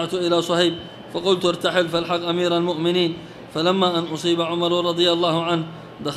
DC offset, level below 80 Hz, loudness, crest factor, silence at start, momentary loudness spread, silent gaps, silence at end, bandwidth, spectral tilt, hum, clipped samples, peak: under 0.1%; -58 dBFS; -21 LUFS; 16 dB; 0 s; 8 LU; none; 0 s; 13 kHz; -5 dB/octave; none; under 0.1%; -4 dBFS